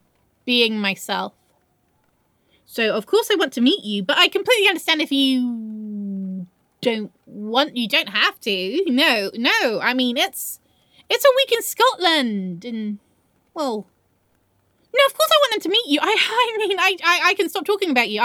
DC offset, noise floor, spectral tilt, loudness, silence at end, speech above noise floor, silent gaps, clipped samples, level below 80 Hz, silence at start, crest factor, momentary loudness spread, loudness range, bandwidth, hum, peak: under 0.1%; -64 dBFS; -3 dB/octave; -19 LUFS; 0 s; 45 dB; none; under 0.1%; -74 dBFS; 0.45 s; 20 dB; 14 LU; 5 LU; over 20 kHz; none; -2 dBFS